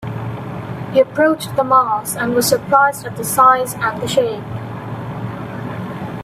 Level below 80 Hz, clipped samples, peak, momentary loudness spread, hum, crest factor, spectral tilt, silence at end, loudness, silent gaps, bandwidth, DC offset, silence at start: -52 dBFS; under 0.1%; 0 dBFS; 15 LU; none; 16 dB; -4.5 dB/octave; 0 s; -17 LUFS; none; 16 kHz; under 0.1%; 0 s